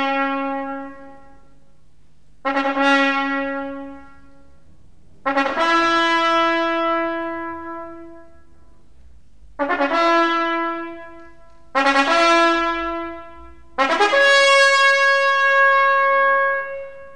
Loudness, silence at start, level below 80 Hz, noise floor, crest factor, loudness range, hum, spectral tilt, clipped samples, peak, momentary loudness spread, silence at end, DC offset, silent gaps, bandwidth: -17 LUFS; 0 s; -52 dBFS; -56 dBFS; 18 dB; 8 LU; none; -2 dB/octave; under 0.1%; -2 dBFS; 18 LU; 0.05 s; 0.9%; none; 10.5 kHz